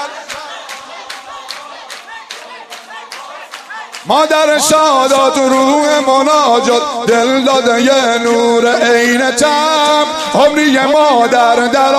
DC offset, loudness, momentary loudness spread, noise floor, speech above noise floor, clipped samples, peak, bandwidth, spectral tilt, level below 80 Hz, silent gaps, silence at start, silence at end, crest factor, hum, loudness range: under 0.1%; -10 LUFS; 19 LU; -31 dBFS; 21 dB; under 0.1%; 0 dBFS; 15 kHz; -2.5 dB/octave; -54 dBFS; none; 0 s; 0 s; 12 dB; none; 17 LU